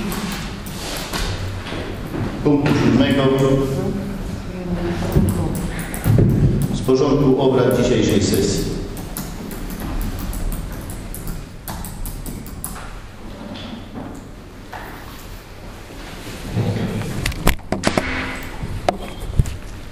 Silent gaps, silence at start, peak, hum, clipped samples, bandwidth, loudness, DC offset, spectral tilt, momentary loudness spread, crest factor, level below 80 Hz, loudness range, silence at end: none; 0 s; 0 dBFS; none; under 0.1%; 16 kHz; -21 LUFS; under 0.1%; -6 dB/octave; 18 LU; 20 dB; -30 dBFS; 15 LU; 0 s